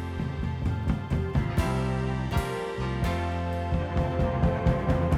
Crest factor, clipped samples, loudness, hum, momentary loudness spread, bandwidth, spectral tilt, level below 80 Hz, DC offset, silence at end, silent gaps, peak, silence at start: 16 dB; under 0.1%; -28 LUFS; none; 5 LU; 14.5 kHz; -7.5 dB/octave; -34 dBFS; under 0.1%; 0 s; none; -10 dBFS; 0 s